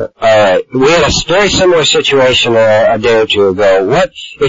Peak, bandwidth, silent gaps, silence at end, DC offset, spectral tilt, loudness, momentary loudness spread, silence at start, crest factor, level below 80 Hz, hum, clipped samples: 0 dBFS; 7.8 kHz; none; 0 s; 0.7%; -3.5 dB/octave; -9 LUFS; 3 LU; 0 s; 8 dB; -34 dBFS; none; under 0.1%